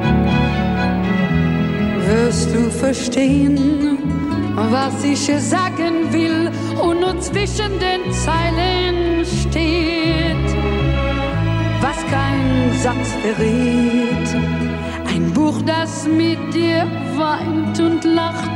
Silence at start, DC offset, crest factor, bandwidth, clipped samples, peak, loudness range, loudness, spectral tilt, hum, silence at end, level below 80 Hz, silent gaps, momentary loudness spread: 0 s; under 0.1%; 14 dB; 12 kHz; under 0.1%; -4 dBFS; 1 LU; -17 LUFS; -5.5 dB/octave; none; 0 s; -30 dBFS; none; 4 LU